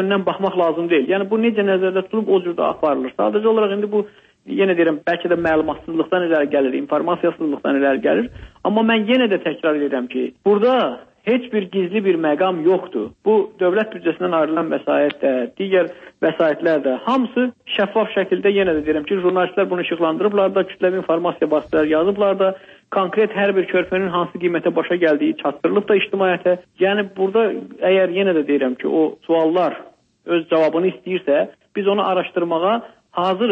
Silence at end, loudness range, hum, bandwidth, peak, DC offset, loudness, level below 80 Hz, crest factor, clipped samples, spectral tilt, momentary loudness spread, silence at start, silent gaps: 0 s; 1 LU; none; 5.4 kHz; -6 dBFS; under 0.1%; -19 LUFS; -56 dBFS; 12 dB; under 0.1%; -8 dB/octave; 5 LU; 0 s; none